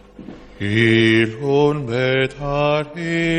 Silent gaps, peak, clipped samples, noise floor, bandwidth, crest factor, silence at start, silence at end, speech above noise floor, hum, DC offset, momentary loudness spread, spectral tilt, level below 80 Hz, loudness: none; -4 dBFS; under 0.1%; -38 dBFS; 9.4 kHz; 14 dB; 0.2 s; 0 s; 21 dB; none; under 0.1%; 8 LU; -6.5 dB/octave; -44 dBFS; -18 LUFS